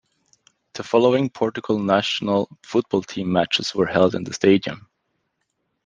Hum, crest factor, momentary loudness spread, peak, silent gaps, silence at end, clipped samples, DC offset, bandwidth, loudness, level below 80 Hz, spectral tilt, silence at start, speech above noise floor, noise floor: none; 20 dB; 7 LU; -2 dBFS; none; 1.05 s; under 0.1%; under 0.1%; 9.6 kHz; -21 LUFS; -62 dBFS; -5.5 dB/octave; 0.75 s; 54 dB; -74 dBFS